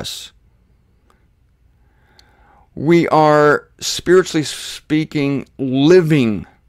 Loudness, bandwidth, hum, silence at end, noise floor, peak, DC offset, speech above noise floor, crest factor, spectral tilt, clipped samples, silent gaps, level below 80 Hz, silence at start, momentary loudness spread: -15 LUFS; 15.5 kHz; none; 0.25 s; -56 dBFS; -2 dBFS; under 0.1%; 41 dB; 14 dB; -5.5 dB/octave; under 0.1%; none; -50 dBFS; 0 s; 12 LU